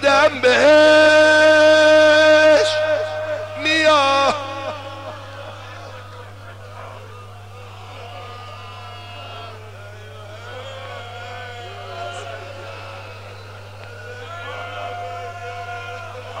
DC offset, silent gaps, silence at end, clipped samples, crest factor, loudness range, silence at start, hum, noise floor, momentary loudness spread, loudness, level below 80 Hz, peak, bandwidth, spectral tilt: 0.4%; none; 0 s; under 0.1%; 16 dB; 23 LU; 0 s; 50 Hz at -40 dBFS; -37 dBFS; 26 LU; -13 LUFS; -58 dBFS; -4 dBFS; 11.5 kHz; -3.5 dB/octave